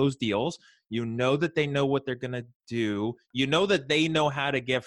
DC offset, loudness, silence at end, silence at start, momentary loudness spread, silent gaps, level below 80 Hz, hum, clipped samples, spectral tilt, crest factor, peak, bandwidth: under 0.1%; -27 LUFS; 0 s; 0 s; 11 LU; 2.55-2.60 s; -62 dBFS; none; under 0.1%; -5.5 dB/octave; 16 dB; -10 dBFS; 11.5 kHz